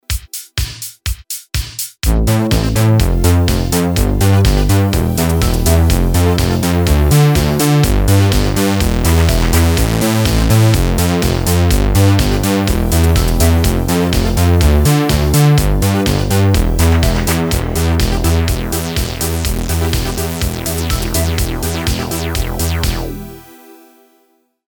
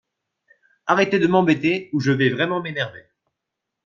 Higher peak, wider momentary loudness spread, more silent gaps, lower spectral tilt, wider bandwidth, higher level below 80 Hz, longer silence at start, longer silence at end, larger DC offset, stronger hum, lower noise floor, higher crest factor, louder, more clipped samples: about the same, 0 dBFS vs -2 dBFS; about the same, 8 LU vs 10 LU; neither; about the same, -5.5 dB/octave vs -6.5 dB/octave; first, over 20 kHz vs 7.4 kHz; first, -18 dBFS vs -62 dBFS; second, 0.1 s vs 0.85 s; first, 1.25 s vs 0.85 s; neither; neither; second, -58 dBFS vs -82 dBFS; second, 12 dB vs 20 dB; first, -14 LUFS vs -20 LUFS; neither